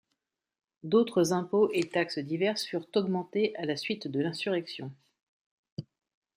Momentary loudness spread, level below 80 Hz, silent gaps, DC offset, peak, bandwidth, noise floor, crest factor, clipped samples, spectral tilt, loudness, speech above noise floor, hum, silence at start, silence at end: 18 LU; -78 dBFS; 5.23-5.64 s, 5.72-5.77 s; under 0.1%; -12 dBFS; 15.5 kHz; -83 dBFS; 18 dB; under 0.1%; -5.5 dB/octave; -30 LUFS; 54 dB; none; 0.85 s; 0.55 s